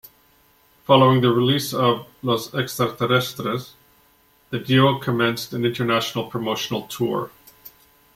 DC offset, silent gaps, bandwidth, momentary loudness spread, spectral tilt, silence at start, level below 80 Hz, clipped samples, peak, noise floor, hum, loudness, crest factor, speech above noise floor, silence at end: under 0.1%; none; 16.5 kHz; 11 LU; -5.5 dB/octave; 0.9 s; -58 dBFS; under 0.1%; -2 dBFS; -58 dBFS; none; -21 LUFS; 20 dB; 38 dB; 0.5 s